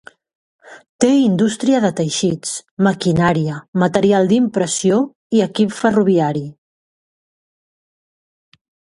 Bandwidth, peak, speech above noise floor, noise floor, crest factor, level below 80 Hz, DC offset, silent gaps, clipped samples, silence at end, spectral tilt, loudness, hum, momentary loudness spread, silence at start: 11.5 kHz; 0 dBFS; over 75 dB; under -90 dBFS; 18 dB; -52 dBFS; under 0.1%; 0.89-0.99 s, 2.71-2.77 s, 3.68-3.73 s, 5.15-5.30 s; under 0.1%; 2.5 s; -5.5 dB/octave; -16 LUFS; none; 7 LU; 0.7 s